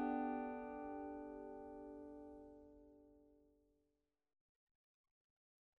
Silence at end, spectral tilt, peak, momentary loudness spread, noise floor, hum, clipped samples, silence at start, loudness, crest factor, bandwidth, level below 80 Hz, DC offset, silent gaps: 2.35 s; -5.5 dB/octave; -30 dBFS; 22 LU; -88 dBFS; none; under 0.1%; 0 s; -49 LUFS; 20 dB; 4.1 kHz; -76 dBFS; under 0.1%; none